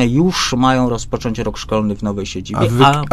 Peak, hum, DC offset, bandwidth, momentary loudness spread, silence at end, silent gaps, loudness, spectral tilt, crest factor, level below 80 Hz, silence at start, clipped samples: 0 dBFS; none; under 0.1%; 14 kHz; 10 LU; 0 s; none; -16 LUFS; -5.5 dB/octave; 16 dB; -34 dBFS; 0 s; under 0.1%